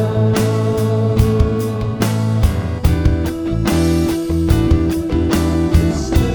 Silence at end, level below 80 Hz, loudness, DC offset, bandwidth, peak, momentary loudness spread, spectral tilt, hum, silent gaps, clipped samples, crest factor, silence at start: 0 s; -22 dBFS; -16 LUFS; under 0.1%; over 20 kHz; 0 dBFS; 4 LU; -7 dB/octave; none; none; under 0.1%; 14 dB; 0 s